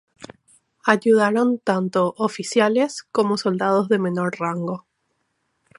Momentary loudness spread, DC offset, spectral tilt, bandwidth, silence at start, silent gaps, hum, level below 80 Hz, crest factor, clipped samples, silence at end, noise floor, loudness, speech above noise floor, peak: 9 LU; under 0.1%; -5.5 dB/octave; 11.5 kHz; 0.2 s; none; none; -70 dBFS; 22 dB; under 0.1%; 1 s; -72 dBFS; -20 LUFS; 52 dB; 0 dBFS